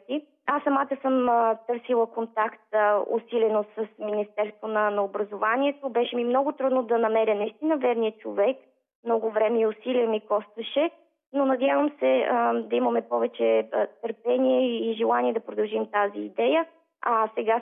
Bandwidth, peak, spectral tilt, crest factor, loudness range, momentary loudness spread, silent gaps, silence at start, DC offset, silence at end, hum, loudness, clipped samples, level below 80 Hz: 3.9 kHz; -12 dBFS; -8.5 dB/octave; 14 dB; 2 LU; 7 LU; 8.95-9.03 s; 0.1 s; under 0.1%; 0 s; none; -25 LUFS; under 0.1%; -82 dBFS